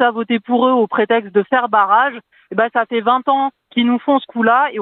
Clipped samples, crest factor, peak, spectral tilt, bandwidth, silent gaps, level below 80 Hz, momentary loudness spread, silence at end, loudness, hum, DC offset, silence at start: under 0.1%; 16 dB; 0 dBFS; -8.5 dB/octave; 4.1 kHz; none; -74 dBFS; 6 LU; 0 s; -16 LUFS; none; under 0.1%; 0 s